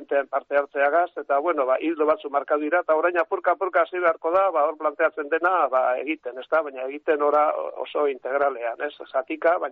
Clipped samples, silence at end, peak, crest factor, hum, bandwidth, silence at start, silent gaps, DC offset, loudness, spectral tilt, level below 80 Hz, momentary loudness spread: under 0.1%; 0 s; -8 dBFS; 14 dB; none; 4.6 kHz; 0 s; none; under 0.1%; -23 LUFS; -0.5 dB/octave; -74 dBFS; 8 LU